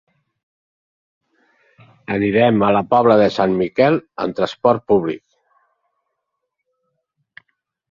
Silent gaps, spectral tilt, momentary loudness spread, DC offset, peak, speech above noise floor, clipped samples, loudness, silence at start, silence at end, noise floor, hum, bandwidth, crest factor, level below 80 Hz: none; -7.5 dB/octave; 11 LU; under 0.1%; -2 dBFS; 61 dB; under 0.1%; -16 LUFS; 2.1 s; 2.75 s; -77 dBFS; none; 7.4 kHz; 18 dB; -56 dBFS